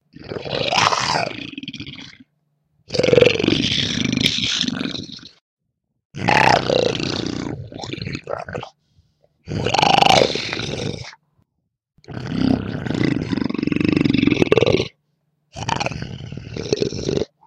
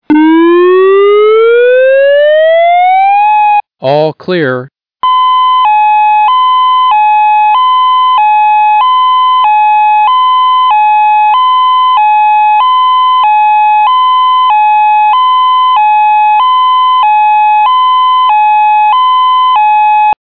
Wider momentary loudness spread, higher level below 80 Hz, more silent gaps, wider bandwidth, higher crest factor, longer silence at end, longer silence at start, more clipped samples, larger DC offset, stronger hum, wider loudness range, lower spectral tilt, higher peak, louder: first, 19 LU vs 1 LU; first, -46 dBFS vs -62 dBFS; first, 5.41-5.57 s, 6.05-6.10 s vs none; first, 16 kHz vs 5 kHz; first, 20 dB vs 6 dB; first, 0.2 s vs 0.05 s; about the same, 0.2 s vs 0.1 s; neither; second, under 0.1% vs 1%; neither; about the same, 4 LU vs 2 LU; second, -4.5 dB/octave vs -7.5 dB/octave; about the same, 0 dBFS vs 0 dBFS; second, -19 LUFS vs -6 LUFS